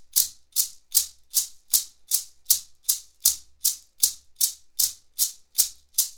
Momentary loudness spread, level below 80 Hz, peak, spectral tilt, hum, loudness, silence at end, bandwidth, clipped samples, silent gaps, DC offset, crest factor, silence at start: 3 LU; -62 dBFS; 0 dBFS; 4 dB/octave; none; -24 LUFS; 0 s; over 20 kHz; under 0.1%; none; under 0.1%; 26 dB; 0 s